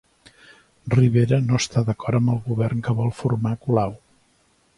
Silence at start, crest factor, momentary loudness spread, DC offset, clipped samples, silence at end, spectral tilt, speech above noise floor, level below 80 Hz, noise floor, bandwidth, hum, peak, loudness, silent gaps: 0.85 s; 16 dB; 6 LU; under 0.1%; under 0.1%; 0.8 s; -7 dB/octave; 42 dB; -50 dBFS; -62 dBFS; 11 kHz; none; -6 dBFS; -22 LUFS; none